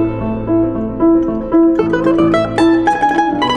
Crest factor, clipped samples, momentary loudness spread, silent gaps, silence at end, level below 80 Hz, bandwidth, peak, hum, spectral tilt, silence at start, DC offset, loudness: 12 dB; under 0.1%; 5 LU; none; 0 s; -34 dBFS; 9.4 kHz; 0 dBFS; none; -7 dB/octave; 0 s; under 0.1%; -13 LUFS